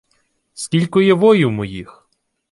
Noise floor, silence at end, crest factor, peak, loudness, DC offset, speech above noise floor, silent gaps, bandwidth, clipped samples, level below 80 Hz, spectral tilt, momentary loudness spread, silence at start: -65 dBFS; 0.7 s; 16 dB; -2 dBFS; -15 LUFS; under 0.1%; 51 dB; none; 11.5 kHz; under 0.1%; -52 dBFS; -6 dB/octave; 17 LU; 0.55 s